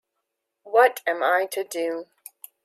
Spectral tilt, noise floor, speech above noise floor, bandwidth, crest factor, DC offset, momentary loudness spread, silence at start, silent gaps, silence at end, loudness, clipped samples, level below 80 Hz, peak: -1 dB/octave; -80 dBFS; 58 dB; 16 kHz; 20 dB; under 0.1%; 24 LU; 0.65 s; none; 0.6 s; -23 LUFS; under 0.1%; -90 dBFS; -6 dBFS